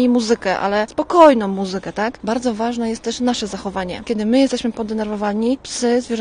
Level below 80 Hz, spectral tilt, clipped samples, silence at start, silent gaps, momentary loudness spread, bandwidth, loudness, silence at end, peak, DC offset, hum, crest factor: -48 dBFS; -4.5 dB/octave; under 0.1%; 0 s; none; 12 LU; 10 kHz; -18 LUFS; 0 s; 0 dBFS; under 0.1%; none; 18 dB